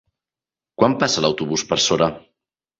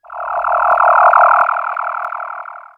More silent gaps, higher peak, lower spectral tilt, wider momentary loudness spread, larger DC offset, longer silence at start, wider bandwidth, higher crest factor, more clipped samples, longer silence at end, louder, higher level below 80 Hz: neither; about the same, -2 dBFS vs 0 dBFS; about the same, -3.5 dB/octave vs -3 dB/octave; second, 5 LU vs 16 LU; neither; first, 0.8 s vs 0.1 s; first, 8 kHz vs 4.7 kHz; first, 20 dB vs 14 dB; neither; first, 0.6 s vs 0.15 s; second, -19 LUFS vs -12 LUFS; about the same, -54 dBFS vs -56 dBFS